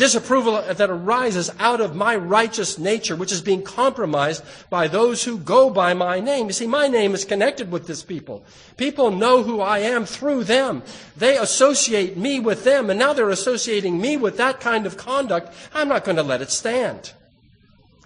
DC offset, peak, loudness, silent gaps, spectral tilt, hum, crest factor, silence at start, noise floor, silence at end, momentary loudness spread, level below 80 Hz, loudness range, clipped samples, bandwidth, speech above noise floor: under 0.1%; -2 dBFS; -20 LUFS; none; -3 dB/octave; none; 18 dB; 0 s; -54 dBFS; 0.95 s; 9 LU; -62 dBFS; 3 LU; under 0.1%; 10 kHz; 35 dB